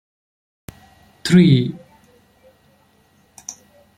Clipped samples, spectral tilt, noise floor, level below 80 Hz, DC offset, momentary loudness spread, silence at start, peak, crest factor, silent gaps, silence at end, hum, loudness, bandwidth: under 0.1%; -6.5 dB/octave; -57 dBFS; -56 dBFS; under 0.1%; 24 LU; 1.25 s; -2 dBFS; 20 dB; none; 0.45 s; none; -15 LUFS; 13 kHz